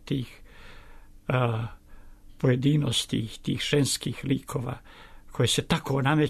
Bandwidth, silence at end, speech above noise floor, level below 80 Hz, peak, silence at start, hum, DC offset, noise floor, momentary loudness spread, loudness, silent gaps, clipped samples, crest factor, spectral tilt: 13.5 kHz; 0 s; 21 dB; -48 dBFS; -12 dBFS; 0.05 s; none; under 0.1%; -47 dBFS; 14 LU; -27 LUFS; none; under 0.1%; 16 dB; -5 dB/octave